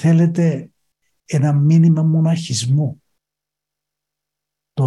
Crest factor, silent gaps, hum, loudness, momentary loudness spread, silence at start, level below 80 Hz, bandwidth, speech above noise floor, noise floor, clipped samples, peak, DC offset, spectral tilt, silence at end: 12 dB; none; 50 Hz at -35 dBFS; -16 LUFS; 11 LU; 0 s; -60 dBFS; 11 kHz; 70 dB; -84 dBFS; under 0.1%; -4 dBFS; under 0.1%; -7 dB/octave; 0 s